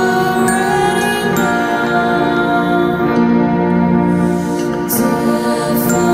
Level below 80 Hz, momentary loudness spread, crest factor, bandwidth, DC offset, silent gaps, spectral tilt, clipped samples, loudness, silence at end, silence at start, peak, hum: -44 dBFS; 3 LU; 12 dB; 16.5 kHz; under 0.1%; none; -5.5 dB/octave; under 0.1%; -14 LUFS; 0 s; 0 s; 0 dBFS; none